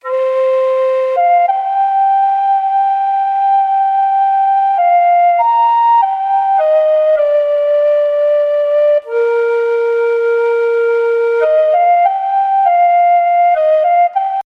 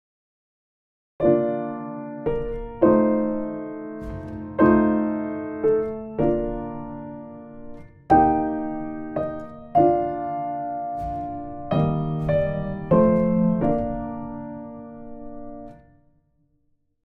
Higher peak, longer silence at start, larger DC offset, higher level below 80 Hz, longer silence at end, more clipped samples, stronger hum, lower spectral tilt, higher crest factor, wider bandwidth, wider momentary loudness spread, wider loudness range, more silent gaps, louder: about the same, -2 dBFS vs -4 dBFS; second, 0.05 s vs 1.2 s; neither; second, -64 dBFS vs -44 dBFS; second, 0.05 s vs 1.25 s; neither; neither; second, -1.5 dB/octave vs -11 dB/octave; second, 10 dB vs 20 dB; first, 5.8 kHz vs 4.5 kHz; second, 4 LU vs 20 LU; about the same, 2 LU vs 3 LU; neither; first, -12 LUFS vs -23 LUFS